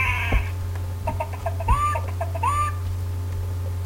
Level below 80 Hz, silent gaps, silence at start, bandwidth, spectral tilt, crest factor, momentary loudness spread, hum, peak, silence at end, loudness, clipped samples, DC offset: -32 dBFS; none; 0 s; 16.5 kHz; -5.5 dB/octave; 16 dB; 7 LU; none; -8 dBFS; 0 s; -26 LUFS; under 0.1%; under 0.1%